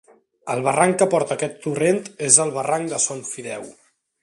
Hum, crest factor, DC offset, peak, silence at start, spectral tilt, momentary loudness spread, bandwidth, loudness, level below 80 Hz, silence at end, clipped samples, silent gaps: none; 22 dB; under 0.1%; 0 dBFS; 0.45 s; -3.5 dB/octave; 16 LU; 12.5 kHz; -20 LUFS; -66 dBFS; 0.5 s; under 0.1%; none